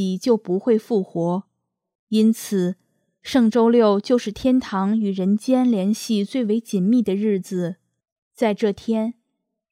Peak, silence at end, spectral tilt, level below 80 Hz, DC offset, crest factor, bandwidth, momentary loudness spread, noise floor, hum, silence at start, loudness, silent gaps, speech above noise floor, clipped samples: -6 dBFS; 0.6 s; -6.5 dB/octave; -60 dBFS; under 0.1%; 16 dB; 15 kHz; 9 LU; -77 dBFS; none; 0 s; -21 LUFS; 1.95-2.07 s, 8.12-8.31 s; 58 dB; under 0.1%